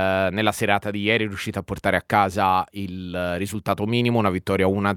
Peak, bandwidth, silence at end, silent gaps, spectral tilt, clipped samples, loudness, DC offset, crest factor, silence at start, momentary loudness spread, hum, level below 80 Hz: -2 dBFS; 18 kHz; 0 s; none; -5.5 dB/octave; under 0.1%; -22 LUFS; under 0.1%; 20 dB; 0 s; 8 LU; none; -52 dBFS